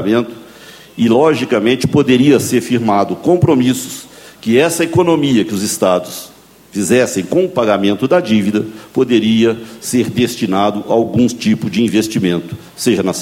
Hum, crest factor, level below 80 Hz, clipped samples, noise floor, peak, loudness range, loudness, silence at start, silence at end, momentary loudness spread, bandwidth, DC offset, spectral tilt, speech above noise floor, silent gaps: none; 14 dB; -50 dBFS; under 0.1%; -38 dBFS; 0 dBFS; 2 LU; -14 LUFS; 0 s; 0 s; 10 LU; 16.5 kHz; under 0.1%; -5.5 dB/octave; 25 dB; none